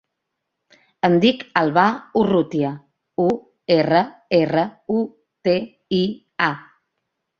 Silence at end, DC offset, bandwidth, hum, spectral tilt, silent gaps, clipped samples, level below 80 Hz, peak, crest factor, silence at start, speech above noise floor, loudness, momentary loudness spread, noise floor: 0.8 s; under 0.1%; 7 kHz; none; -7.5 dB/octave; none; under 0.1%; -60 dBFS; -2 dBFS; 20 dB; 1.05 s; 60 dB; -20 LUFS; 10 LU; -79 dBFS